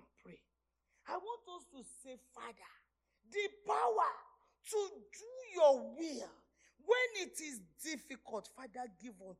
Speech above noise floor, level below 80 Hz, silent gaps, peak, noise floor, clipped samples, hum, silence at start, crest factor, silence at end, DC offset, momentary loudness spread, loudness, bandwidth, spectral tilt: 46 dB; -82 dBFS; none; -18 dBFS; -85 dBFS; under 0.1%; none; 0.25 s; 22 dB; 0.05 s; under 0.1%; 21 LU; -38 LUFS; 14.5 kHz; -2 dB/octave